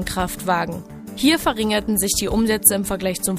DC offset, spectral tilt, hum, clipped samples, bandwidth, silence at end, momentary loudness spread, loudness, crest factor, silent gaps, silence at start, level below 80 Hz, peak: under 0.1%; -3 dB/octave; none; under 0.1%; 15.5 kHz; 0 s; 9 LU; -19 LUFS; 20 dB; none; 0 s; -38 dBFS; 0 dBFS